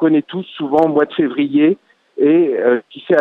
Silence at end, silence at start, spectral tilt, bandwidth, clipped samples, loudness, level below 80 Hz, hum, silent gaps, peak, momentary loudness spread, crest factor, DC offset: 0 s; 0 s; -8.5 dB/octave; 4.1 kHz; under 0.1%; -15 LUFS; -62 dBFS; none; none; -2 dBFS; 11 LU; 12 dB; under 0.1%